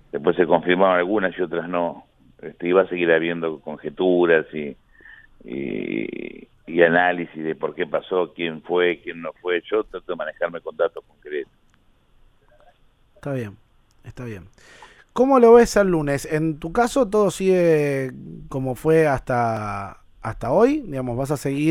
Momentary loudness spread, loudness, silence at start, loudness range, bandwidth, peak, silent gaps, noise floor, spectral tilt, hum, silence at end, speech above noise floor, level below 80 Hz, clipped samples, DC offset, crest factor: 16 LU; -21 LUFS; 0.15 s; 13 LU; 15 kHz; 0 dBFS; none; -58 dBFS; -6 dB/octave; none; 0 s; 37 dB; -48 dBFS; under 0.1%; under 0.1%; 20 dB